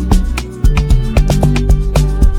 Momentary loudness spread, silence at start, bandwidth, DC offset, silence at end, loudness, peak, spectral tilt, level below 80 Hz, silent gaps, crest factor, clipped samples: 3 LU; 0 s; 15.5 kHz; under 0.1%; 0 s; -14 LUFS; 0 dBFS; -6.5 dB/octave; -12 dBFS; none; 10 dB; under 0.1%